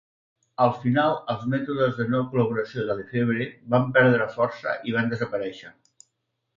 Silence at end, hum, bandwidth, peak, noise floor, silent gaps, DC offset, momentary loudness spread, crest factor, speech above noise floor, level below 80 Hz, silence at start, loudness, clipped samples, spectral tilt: 0.85 s; none; 7.6 kHz; -6 dBFS; -77 dBFS; none; under 0.1%; 9 LU; 20 dB; 54 dB; -62 dBFS; 0.6 s; -24 LUFS; under 0.1%; -8 dB/octave